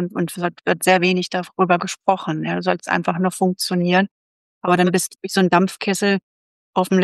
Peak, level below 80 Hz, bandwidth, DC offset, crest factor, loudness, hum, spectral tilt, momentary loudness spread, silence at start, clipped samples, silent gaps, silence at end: -2 dBFS; -68 dBFS; 12.5 kHz; under 0.1%; 18 dB; -19 LUFS; none; -5 dB/octave; 7 LU; 0 s; under 0.1%; 4.11-4.61 s, 6.23-6.73 s; 0 s